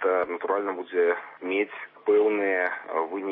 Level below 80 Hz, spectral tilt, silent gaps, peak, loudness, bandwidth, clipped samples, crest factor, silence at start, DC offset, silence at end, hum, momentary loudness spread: -80 dBFS; -8.5 dB/octave; none; -12 dBFS; -26 LUFS; 3.9 kHz; under 0.1%; 14 dB; 0 s; under 0.1%; 0 s; none; 8 LU